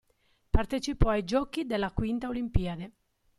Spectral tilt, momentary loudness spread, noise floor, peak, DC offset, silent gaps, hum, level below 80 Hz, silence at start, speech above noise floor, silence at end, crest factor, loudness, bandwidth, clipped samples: -6.5 dB/octave; 6 LU; -70 dBFS; -8 dBFS; under 0.1%; none; none; -34 dBFS; 0.55 s; 41 dB; 0.5 s; 20 dB; -31 LUFS; 12 kHz; under 0.1%